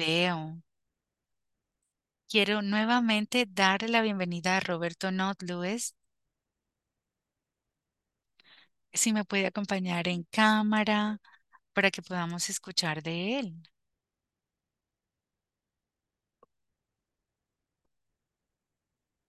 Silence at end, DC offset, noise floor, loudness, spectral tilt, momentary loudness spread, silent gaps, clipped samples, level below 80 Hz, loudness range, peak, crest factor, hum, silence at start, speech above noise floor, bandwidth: 5.7 s; under 0.1%; -89 dBFS; -29 LUFS; -3.5 dB/octave; 9 LU; none; under 0.1%; -78 dBFS; 11 LU; -8 dBFS; 24 dB; none; 0 s; 60 dB; 12.5 kHz